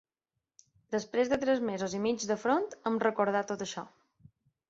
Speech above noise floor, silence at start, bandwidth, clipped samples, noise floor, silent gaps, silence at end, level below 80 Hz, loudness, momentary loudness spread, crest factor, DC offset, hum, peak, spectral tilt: 57 dB; 0.9 s; 8 kHz; under 0.1%; -88 dBFS; none; 0.8 s; -68 dBFS; -31 LUFS; 8 LU; 20 dB; under 0.1%; none; -12 dBFS; -4.5 dB/octave